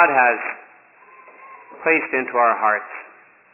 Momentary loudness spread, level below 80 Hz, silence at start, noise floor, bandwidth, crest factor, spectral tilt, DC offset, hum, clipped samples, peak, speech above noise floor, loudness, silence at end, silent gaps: 18 LU; -86 dBFS; 0 s; -48 dBFS; 3 kHz; 20 dB; -8.5 dB/octave; under 0.1%; none; under 0.1%; -2 dBFS; 29 dB; -19 LUFS; 0.5 s; none